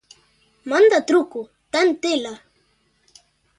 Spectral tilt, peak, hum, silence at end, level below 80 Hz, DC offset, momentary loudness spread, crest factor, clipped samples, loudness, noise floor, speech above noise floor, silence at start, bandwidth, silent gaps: -2.5 dB/octave; -4 dBFS; none; 1.25 s; -68 dBFS; under 0.1%; 19 LU; 16 dB; under 0.1%; -19 LUFS; -64 dBFS; 46 dB; 0.65 s; 11 kHz; none